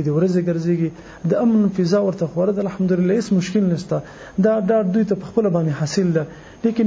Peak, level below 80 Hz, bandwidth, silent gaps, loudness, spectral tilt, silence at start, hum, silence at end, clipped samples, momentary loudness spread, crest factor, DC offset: -4 dBFS; -52 dBFS; 8 kHz; none; -19 LUFS; -7.5 dB/octave; 0 s; none; 0 s; under 0.1%; 7 LU; 14 dB; under 0.1%